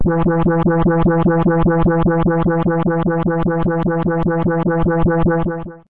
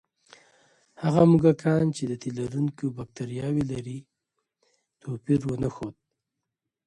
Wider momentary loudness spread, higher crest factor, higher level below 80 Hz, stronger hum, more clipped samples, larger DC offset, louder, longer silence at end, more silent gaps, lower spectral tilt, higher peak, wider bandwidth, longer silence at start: second, 3 LU vs 19 LU; second, 8 dB vs 20 dB; first, -28 dBFS vs -56 dBFS; neither; neither; first, 2% vs under 0.1%; first, -16 LUFS vs -26 LUFS; second, 0 s vs 0.95 s; neither; first, -12 dB/octave vs -8 dB/octave; about the same, -6 dBFS vs -6 dBFS; second, 3.8 kHz vs 10.5 kHz; second, 0 s vs 1 s